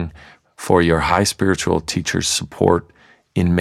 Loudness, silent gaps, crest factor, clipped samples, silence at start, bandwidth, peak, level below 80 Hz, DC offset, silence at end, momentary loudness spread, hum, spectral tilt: -18 LUFS; none; 18 dB; under 0.1%; 0 s; 15 kHz; -2 dBFS; -38 dBFS; under 0.1%; 0 s; 7 LU; none; -4.5 dB/octave